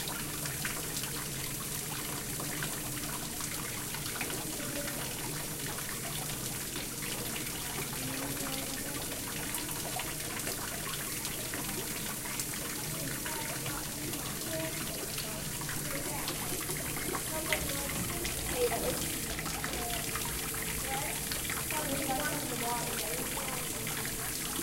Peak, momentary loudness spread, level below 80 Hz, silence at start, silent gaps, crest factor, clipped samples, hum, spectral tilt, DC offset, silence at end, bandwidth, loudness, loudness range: -12 dBFS; 3 LU; -50 dBFS; 0 s; none; 24 dB; under 0.1%; none; -2.5 dB/octave; under 0.1%; 0 s; 17 kHz; -34 LUFS; 2 LU